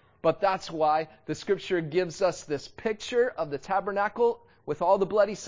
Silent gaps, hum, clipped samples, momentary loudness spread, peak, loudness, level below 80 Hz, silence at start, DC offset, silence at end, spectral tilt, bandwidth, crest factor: none; none; under 0.1%; 9 LU; -12 dBFS; -28 LUFS; -62 dBFS; 0.25 s; under 0.1%; 0 s; -5 dB/octave; 7.6 kHz; 16 dB